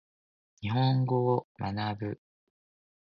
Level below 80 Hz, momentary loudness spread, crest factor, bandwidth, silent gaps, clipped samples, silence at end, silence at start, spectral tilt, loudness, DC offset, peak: -60 dBFS; 12 LU; 16 dB; 5.8 kHz; 1.44-1.55 s; under 0.1%; 0.95 s; 0.6 s; -9.5 dB/octave; -30 LUFS; under 0.1%; -14 dBFS